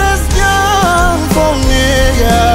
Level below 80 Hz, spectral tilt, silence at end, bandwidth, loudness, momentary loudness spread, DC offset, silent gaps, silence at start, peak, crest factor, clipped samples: -14 dBFS; -4 dB/octave; 0 s; 16.5 kHz; -11 LUFS; 2 LU; under 0.1%; none; 0 s; 0 dBFS; 10 dB; under 0.1%